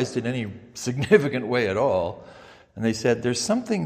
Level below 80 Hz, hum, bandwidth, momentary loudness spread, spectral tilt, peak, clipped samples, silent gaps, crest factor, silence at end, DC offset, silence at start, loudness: -60 dBFS; none; 15 kHz; 13 LU; -5 dB/octave; -2 dBFS; under 0.1%; none; 22 dB; 0 s; under 0.1%; 0 s; -24 LUFS